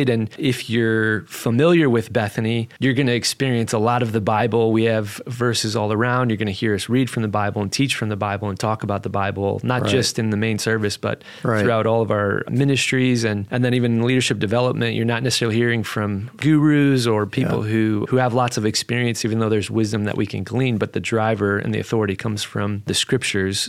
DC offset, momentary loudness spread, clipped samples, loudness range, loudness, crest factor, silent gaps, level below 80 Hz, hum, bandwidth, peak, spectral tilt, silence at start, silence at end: under 0.1%; 6 LU; under 0.1%; 3 LU; -20 LUFS; 16 dB; none; -56 dBFS; none; 15.5 kHz; -4 dBFS; -5.5 dB/octave; 0 s; 0 s